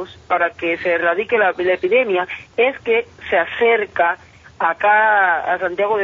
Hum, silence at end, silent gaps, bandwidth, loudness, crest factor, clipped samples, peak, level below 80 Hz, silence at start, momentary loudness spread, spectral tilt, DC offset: none; 0 s; none; 7.2 kHz; -17 LUFS; 16 dB; under 0.1%; -2 dBFS; -56 dBFS; 0 s; 7 LU; -5.5 dB/octave; under 0.1%